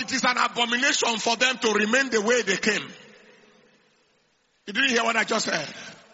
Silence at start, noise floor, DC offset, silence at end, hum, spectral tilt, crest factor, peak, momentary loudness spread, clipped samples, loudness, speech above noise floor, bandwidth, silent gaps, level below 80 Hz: 0 s; -67 dBFS; under 0.1%; 0.2 s; none; -0.5 dB/octave; 20 dB; -4 dBFS; 8 LU; under 0.1%; -22 LUFS; 43 dB; 8 kHz; none; -70 dBFS